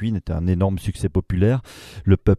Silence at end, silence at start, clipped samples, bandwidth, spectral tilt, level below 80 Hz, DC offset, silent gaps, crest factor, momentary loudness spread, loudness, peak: 0 s; 0 s; under 0.1%; 12.5 kHz; -8.5 dB/octave; -34 dBFS; under 0.1%; none; 18 dB; 6 LU; -22 LUFS; -2 dBFS